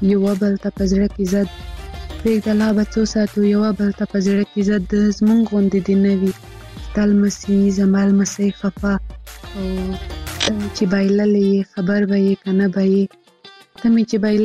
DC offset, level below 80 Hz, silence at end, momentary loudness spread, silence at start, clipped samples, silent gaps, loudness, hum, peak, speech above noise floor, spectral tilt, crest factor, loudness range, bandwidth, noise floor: under 0.1%; -36 dBFS; 0 s; 11 LU; 0 s; under 0.1%; none; -18 LUFS; none; -2 dBFS; 28 dB; -6.5 dB/octave; 16 dB; 3 LU; 12.5 kHz; -45 dBFS